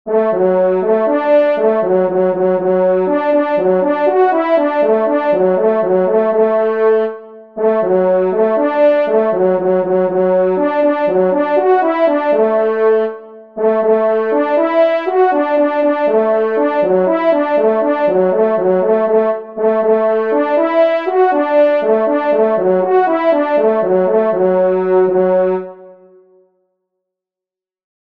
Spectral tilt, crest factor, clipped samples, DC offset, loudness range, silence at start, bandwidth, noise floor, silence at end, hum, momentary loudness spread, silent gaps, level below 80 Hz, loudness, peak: -9 dB/octave; 12 dB; under 0.1%; 0.3%; 1 LU; 0.05 s; 5.2 kHz; -87 dBFS; 2.1 s; none; 2 LU; none; -66 dBFS; -13 LUFS; -2 dBFS